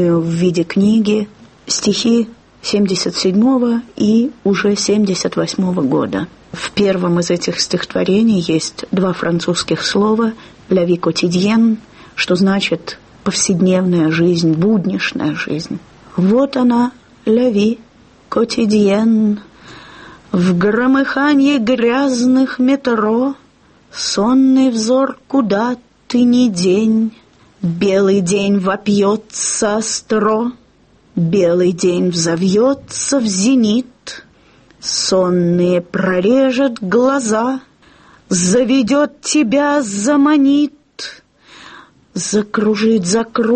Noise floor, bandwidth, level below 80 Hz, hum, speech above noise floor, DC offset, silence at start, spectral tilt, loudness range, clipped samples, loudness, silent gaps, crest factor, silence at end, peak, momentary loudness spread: -50 dBFS; 8.8 kHz; -52 dBFS; none; 36 dB; under 0.1%; 0 s; -5 dB/octave; 2 LU; under 0.1%; -15 LUFS; none; 12 dB; 0 s; -2 dBFS; 9 LU